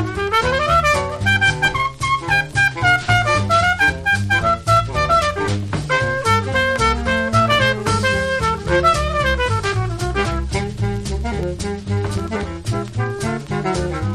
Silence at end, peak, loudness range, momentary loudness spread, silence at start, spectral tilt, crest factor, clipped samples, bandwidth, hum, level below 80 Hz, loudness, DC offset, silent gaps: 0 s; -2 dBFS; 7 LU; 8 LU; 0 s; -4.5 dB/octave; 16 dB; under 0.1%; 13.5 kHz; none; -30 dBFS; -18 LUFS; under 0.1%; none